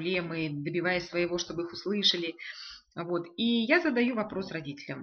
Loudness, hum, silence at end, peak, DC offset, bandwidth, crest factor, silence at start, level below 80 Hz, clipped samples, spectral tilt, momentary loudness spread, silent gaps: -30 LUFS; none; 0 s; -10 dBFS; under 0.1%; 6.8 kHz; 20 dB; 0 s; -66 dBFS; under 0.1%; -2.5 dB/octave; 15 LU; none